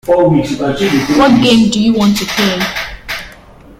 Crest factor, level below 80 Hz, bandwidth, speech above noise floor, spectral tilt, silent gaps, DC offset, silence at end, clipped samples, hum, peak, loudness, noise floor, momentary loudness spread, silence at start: 12 dB; -36 dBFS; 16 kHz; 27 dB; -5 dB/octave; none; under 0.1%; 0.05 s; under 0.1%; none; 0 dBFS; -11 LUFS; -37 dBFS; 13 LU; 0.05 s